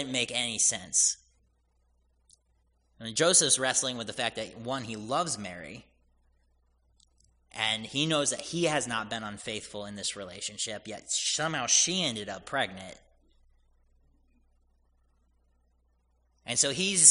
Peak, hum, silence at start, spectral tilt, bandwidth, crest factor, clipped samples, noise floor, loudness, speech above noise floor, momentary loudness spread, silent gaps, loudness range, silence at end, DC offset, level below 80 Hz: -2 dBFS; none; 0 s; -1.5 dB/octave; 11 kHz; 28 dB; under 0.1%; -70 dBFS; -28 LUFS; 41 dB; 16 LU; none; 8 LU; 0 s; under 0.1%; -66 dBFS